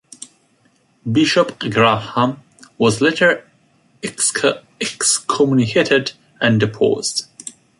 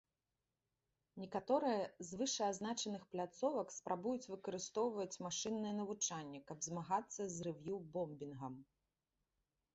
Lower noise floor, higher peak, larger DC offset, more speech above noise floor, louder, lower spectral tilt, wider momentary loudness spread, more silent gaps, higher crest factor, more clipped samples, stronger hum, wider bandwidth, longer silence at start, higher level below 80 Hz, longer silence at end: second, -58 dBFS vs under -90 dBFS; first, -2 dBFS vs -24 dBFS; neither; second, 42 dB vs over 47 dB; first, -17 LUFS vs -43 LUFS; about the same, -3.5 dB/octave vs -4.5 dB/octave; first, 16 LU vs 10 LU; neither; about the same, 18 dB vs 20 dB; neither; neither; first, 11.5 kHz vs 8 kHz; about the same, 1.05 s vs 1.15 s; first, -56 dBFS vs -80 dBFS; second, 0.3 s vs 1.1 s